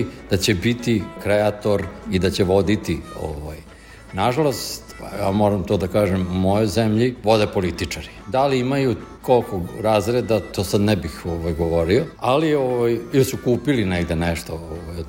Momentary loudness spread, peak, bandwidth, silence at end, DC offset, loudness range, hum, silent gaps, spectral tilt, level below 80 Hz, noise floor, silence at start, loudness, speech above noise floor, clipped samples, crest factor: 10 LU; -4 dBFS; 16.5 kHz; 0 s; under 0.1%; 3 LU; none; none; -6 dB/octave; -40 dBFS; -42 dBFS; 0 s; -21 LUFS; 22 dB; under 0.1%; 16 dB